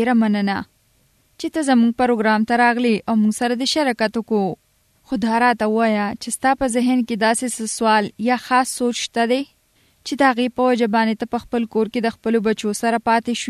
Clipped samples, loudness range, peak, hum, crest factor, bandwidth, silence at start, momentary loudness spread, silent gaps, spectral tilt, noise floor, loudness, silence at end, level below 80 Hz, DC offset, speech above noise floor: under 0.1%; 2 LU; -2 dBFS; none; 16 dB; 13.5 kHz; 0 s; 7 LU; none; -4 dB/octave; -60 dBFS; -19 LUFS; 0 s; -54 dBFS; under 0.1%; 41 dB